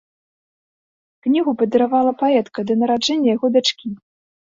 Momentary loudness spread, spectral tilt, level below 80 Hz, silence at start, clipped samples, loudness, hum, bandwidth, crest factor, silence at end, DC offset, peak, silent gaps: 10 LU; -4.5 dB/octave; -64 dBFS; 1.25 s; under 0.1%; -18 LUFS; none; 7.8 kHz; 16 dB; 0.45 s; under 0.1%; -4 dBFS; none